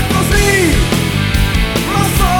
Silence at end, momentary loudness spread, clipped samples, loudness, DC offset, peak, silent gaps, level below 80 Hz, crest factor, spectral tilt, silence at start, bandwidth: 0 s; 4 LU; under 0.1%; -13 LUFS; under 0.1%; 0 dBFS; none; -18 dBFS; 12 dB; -4.5 dB/octave; 0 s; 19 kHz